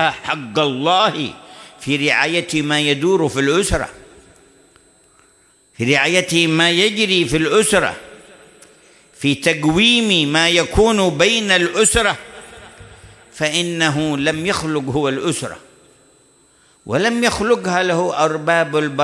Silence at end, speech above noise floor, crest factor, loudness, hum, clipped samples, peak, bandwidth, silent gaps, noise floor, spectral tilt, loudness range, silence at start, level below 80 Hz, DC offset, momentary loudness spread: 0 s; 38 dB; 16 dB; -16 LUFS; none; under 0.1%; -2 dBFS; 12 kHz; none; -54 dBFS; -3.5 dB/octave; 6 LU; 0 s; -40 dBFS; under 0.1%; 10 LU